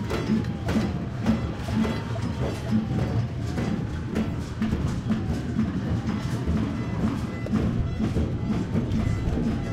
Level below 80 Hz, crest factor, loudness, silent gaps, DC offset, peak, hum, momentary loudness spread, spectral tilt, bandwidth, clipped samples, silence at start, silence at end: -36 dBFS; 14 dB; -27 LUFS; none; under 0.1%; -10 dBFS; none; 3 LU; -7.5 dB/octave; 13.5 kHz; under 0.1%; 0 s; 0 s